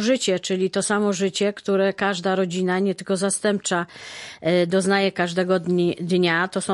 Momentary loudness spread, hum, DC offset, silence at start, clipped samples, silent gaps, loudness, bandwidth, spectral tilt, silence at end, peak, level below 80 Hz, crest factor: 4 LU; none; under 0.1%; 0 s; under 0.1%; none; -22 LUFS; 11.5 kHz; -4.5 dB/octave; 0 s; -8 dBFS; -66 dBFS; 14 dB